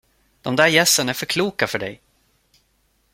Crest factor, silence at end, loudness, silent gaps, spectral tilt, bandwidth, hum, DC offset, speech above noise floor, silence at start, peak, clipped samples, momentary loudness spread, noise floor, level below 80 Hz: 20 dB; 1.2 s; -18 LUFS; none; -2.5 dB/octave; 16.5 kHz; none; under 0.1%; 45 dB; 0.45 s; -2 dBFS; under 0.1%; 15 LU; -64 dBFS; -58 dBFS